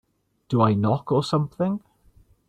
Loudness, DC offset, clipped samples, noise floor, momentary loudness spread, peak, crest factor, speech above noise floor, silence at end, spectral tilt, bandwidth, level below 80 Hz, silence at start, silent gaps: -23 LUFS; under 0.1%; under 0.1%; -57 dBFS; 7 LU; -6 dBFS; 18 dB; 35 dB; 0.7 s; -8 dB/octave; 9.6 kHz; -58 dBFS; 0.5 s; none